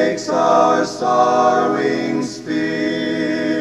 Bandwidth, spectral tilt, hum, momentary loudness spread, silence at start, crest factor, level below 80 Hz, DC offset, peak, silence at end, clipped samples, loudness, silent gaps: 11.5 kHz; -5 dB/octave; none; 8 LU; 0 s; 16 dB; -62 dBFS; 0.1%; -2 dBFS; 0 s; under 0.1%; -17 LUFS; none